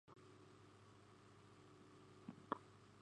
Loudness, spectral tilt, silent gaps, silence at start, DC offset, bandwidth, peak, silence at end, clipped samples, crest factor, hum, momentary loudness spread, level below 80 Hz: -59 LUFS; -6 dB/octave; none; 0.05 s; under 0.1%; 10.5 kHz; -28 dBFS; 0 s; under 0.1%; 32 dB; 50 Hz at -75 dBFS; 15 LU; -84 dBFS